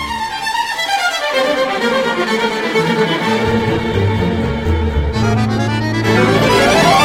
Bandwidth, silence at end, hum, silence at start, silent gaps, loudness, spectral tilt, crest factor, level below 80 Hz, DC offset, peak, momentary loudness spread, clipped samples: 16.5 kHz; 0 s; none; 0 s; none; -15 LUFS; -5 dB/octave; 14 dB; -28 dBFS; under 0.1%; 0 dBFS; 6 LU; under 0.1%